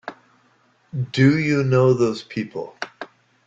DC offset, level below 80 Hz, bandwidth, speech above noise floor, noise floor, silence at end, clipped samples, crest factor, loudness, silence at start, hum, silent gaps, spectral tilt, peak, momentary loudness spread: under 0.1%; -58 dBFS; 7.8 kHz; 41 dB; -60 dBFS; 0.4 s; under 0.1%; 18 dB; -20 LUFS; 0.05 s; none; none; -7.5 dB/octave; -4 dBFS; 19 LU